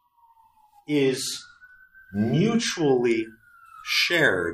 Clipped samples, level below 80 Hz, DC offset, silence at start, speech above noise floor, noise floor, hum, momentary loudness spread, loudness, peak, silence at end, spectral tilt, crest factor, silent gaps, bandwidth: under 0.1%; -64 dBFS; under 0.1%; 0.9 s; 36 dB; -59 dBFS; none; 15 LU; -23 LUFS; -8 dBFS; 0 s; -4.5 dB/octave; 18 dB; none; 15.5 kHz